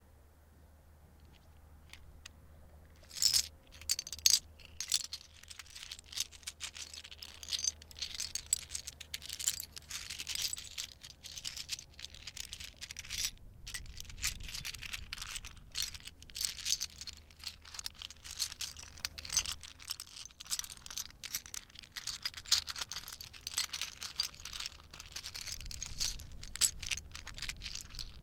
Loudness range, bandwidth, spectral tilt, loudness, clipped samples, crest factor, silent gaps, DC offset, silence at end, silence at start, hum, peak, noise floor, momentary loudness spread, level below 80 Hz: 8 LU; 18 kHz; 1 dB/octave; -38 LUFS; under 0.1%; 40 dB; none; under 0.1%; 0 s; 0 s; none; -2 dBFS; -61 dBFS; 16 LU; -56 dBFS